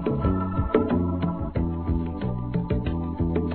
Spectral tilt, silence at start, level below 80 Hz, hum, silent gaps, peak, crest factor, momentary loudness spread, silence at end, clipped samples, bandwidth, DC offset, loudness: -12.5 dB/octave; 0 s; -34 dBFS; none; none; -6 dBFS; 18 dB; 5 LU; 0 s; under 0.1%; 4.4 kHz; 0.4%; -26 LUFS